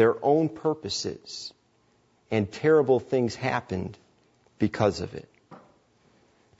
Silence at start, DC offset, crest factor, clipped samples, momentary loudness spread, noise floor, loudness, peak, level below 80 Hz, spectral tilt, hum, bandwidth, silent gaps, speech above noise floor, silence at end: 0 s; under 0.1%; 20 dB; under 0.1%; 16 LU; -65 dBFS; -26 LUFS; -8 dBFS; -60 dBFS; -5.5 dB/octave; none; 8 kHz; none; 40 dB; 1 s